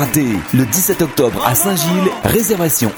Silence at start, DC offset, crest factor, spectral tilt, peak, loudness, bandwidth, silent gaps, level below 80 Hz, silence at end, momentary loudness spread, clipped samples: 0 s; under 0.1%; 14 dB; -4.5 dB/octave; 0 dBFS; -14 LUFS; over 20 kHz; none; -40 dBFS; 0 s; 3 LU; under 0.1%